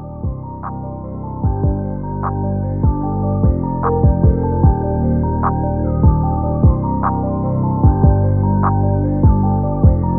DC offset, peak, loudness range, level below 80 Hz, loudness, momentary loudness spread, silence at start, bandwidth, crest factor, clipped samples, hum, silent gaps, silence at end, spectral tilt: under 0.1%; 0 dBFS; 4 LU; -22 dBFS; -16 LUFS; 12 LU; 0 s; 2.2 kHz; 14 dB; under 0.1%; none; none; 0 s; -9.5 dB/octave